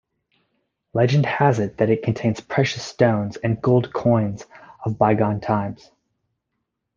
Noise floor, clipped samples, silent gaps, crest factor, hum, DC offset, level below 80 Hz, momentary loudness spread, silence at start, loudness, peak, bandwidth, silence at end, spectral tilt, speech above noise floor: -78 dBFS; under 0.1%; none; 20 dB; none; under 0.1%; -56 dBFS; 9 LU; 0.95 s; -21 LUFS; -2 dBFS; 7.4 kHz; 1.2 s; -7 dB/octave; 58 dB